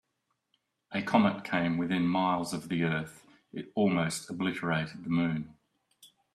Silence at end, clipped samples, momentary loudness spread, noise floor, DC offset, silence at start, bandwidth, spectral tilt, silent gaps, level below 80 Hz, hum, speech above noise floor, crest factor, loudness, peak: 0.3 s; under 0.1%; 11 LU; -80 dBFS; under 0.1%; 0.9 s; 13.5 kHz; -6 dB/octave; none; -68 dBFS; none; 51 dB; 22 dB; -30 LUFS; -10 dBFS